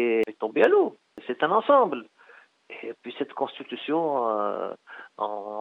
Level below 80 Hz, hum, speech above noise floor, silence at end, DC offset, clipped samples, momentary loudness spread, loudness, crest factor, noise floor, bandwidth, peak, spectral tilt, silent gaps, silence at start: -80 dBFS; none; 30 dB; 0 s; under 0.1%; under 0.1%; 19 LU; -25 LUFS; 20 dB; -55 dBFS; 6.6 kHz; -6 dBFS; -6.5 dB/octave; none; 0 s